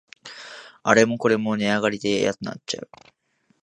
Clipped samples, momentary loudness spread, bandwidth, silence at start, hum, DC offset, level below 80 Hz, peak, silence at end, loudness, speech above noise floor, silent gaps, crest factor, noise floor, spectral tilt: under 0.1%; 21 LU; 11 kHz; 0.25 s; none; under 0.1%; -64 dBFS; 0 dBFS; 0.8 s; -22 LUFS; 45 dB; none; 24 dB; -67 dBFS; -4.5 dB/octave